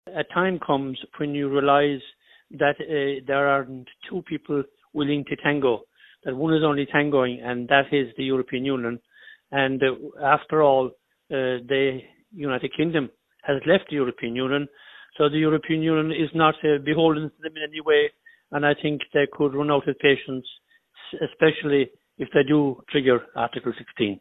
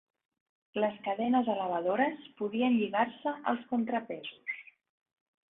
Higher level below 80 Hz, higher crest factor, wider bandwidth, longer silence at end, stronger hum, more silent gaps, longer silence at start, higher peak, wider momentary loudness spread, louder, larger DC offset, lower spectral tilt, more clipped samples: first, -60 dBFS vs -78 dBFS; about the same, 22 dB vs 18 dB; about the same, 4 kHz vs 3.9 kHz; second, 0 s vs 0.85 s; neither; neither; second, 0.05 s vs 0.75 s; first, -2 dBFS vs -16 dBFS; about the same, 12 LU vs 11 LU; first, -23 LUFS vs -32 LUFS; neither; about the same, -9 dB/octave vs -9 dB/octave; neither